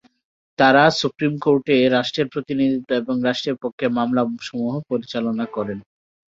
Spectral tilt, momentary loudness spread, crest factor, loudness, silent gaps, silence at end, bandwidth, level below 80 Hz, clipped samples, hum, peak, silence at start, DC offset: -5.5 dB/octave; 11 LU; 18 dB; -20 LUFS; 3.73-3.78 s; 0.45 s; 7.8 kHz; -60 dBFS; under 0.1%; none; -2 dBFS; 0.6 s; under 0.1%